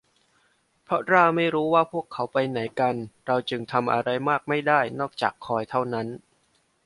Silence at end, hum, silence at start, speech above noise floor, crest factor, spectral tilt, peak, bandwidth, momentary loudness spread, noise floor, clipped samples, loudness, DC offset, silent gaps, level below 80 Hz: 0.7 s; none; 0.9 s; 43 dB; 22 dB; -6.5 dB/octave; -4 dBFS; 11.5 kHz; 9 LU; -67 dBFS; under 0.1%; -24 LUFS; under 0.1%; none; -66 dBFS